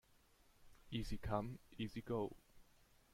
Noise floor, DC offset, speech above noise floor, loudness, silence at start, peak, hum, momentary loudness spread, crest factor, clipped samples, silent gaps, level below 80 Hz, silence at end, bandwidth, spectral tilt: -72 dBFS; under 0.1%; 27 dB; -46 LUFS; 0.6 s; -26 dBFS; none; 6 LU; 22 dB; under 0.1%; none; -58 dBFS; 0.5 s; 16.5 kHz; -6.5 dB/octave